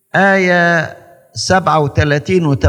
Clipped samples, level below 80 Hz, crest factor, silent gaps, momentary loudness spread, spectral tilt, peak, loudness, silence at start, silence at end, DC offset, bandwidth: under 0.1%; -42 dBFS; 14 dB; none; 10 LU; -5.5 dB/octave; 0 dBFS; -13 LUFS; 0.15 s; 0 s; under 0.1%; 12.5 kHz